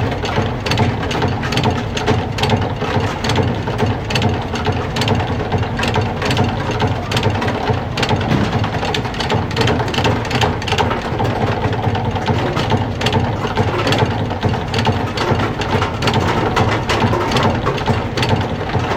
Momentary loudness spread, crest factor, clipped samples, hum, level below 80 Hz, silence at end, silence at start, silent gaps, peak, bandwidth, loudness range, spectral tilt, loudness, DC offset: 3 LU; 16 dB; under 0.1%; none; -34 dBFS; 0 s; 0 s; none; 0 dBFS; 15.5 kHz; 1 LU; -5.5 dB/octave; -17 LUFS; under 0.1%